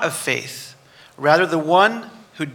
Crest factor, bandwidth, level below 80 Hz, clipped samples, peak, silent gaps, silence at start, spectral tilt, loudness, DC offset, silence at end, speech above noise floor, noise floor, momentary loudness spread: 20 dB; 18 kHz; -70 dBFS; under 0.1%; 0 dBFS; none; 0 s; -4 dB/octave; -18 LUFS; under 0.1%; 0 s; 29 dB; -47 dBFS; 20 LU